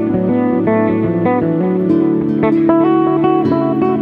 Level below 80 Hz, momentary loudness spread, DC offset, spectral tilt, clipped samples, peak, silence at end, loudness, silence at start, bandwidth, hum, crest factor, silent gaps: -46 dBFS; 3 LU; under 0.1%; -10.5 dB/octave; under 0.1%; 0 dBFS; 0 s; -14 LUFS; 0 s; 4.4 kHz; none; 12 dB; none